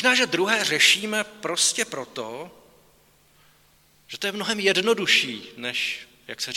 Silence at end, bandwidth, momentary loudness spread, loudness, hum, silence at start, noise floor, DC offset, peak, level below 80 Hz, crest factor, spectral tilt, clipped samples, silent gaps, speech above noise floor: 0 s; 18 kHz; 18 LU; -22 LUFS; none; 0 s; -59 dBFS; under 0.1%; -4 dBFS; -70 dBFS; 22 dB; -1 dB/octave; under 0.1%; none; 35 dB